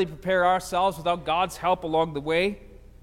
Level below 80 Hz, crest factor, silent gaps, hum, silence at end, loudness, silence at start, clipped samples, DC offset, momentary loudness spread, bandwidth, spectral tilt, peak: -48 dBFS; 16 dB; none; none; 0.2 s; -25 LUFS; 0 s; under 0.1%; under 0.1%; 5 LU; 16.5 kHz; -4.5 dB/octave; -10 dBFS